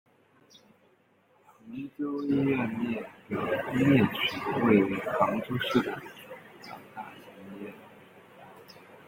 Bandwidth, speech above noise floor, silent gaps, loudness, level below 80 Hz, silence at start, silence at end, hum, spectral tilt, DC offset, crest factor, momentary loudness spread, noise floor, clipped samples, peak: 16.5 kHz; 37 dB; none; -28 LUFS; -64 dBFS; 1.65 s; 0.1 s; none; -7 dB/octave; under 0.1%; 22 dB; 23 LU; -65 dBFS; under 0.1%; -8 dBFS